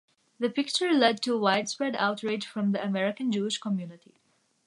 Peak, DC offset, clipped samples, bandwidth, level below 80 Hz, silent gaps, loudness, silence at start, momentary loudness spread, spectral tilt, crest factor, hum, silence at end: -6 dBFS; under 0.1%; under 0.1%; 11.5 kHz; -80 dBFS; none; -28 LUFS; 0.4 s; 9 LU; -4.5 dB/octave; 22 dB; none; 0.7 s